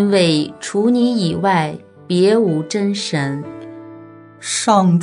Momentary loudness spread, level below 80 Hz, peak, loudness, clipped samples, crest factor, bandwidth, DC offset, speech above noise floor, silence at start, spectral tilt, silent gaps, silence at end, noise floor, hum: 19 LU; -62 dBFS; -2 dBFS; -17 LUFS; under 0.1%; 16 dB; 11 kHz; under 0.1%; 23 dB; 0 s; -5.5 dB/octave; none; 0 s; -39 dBFS; none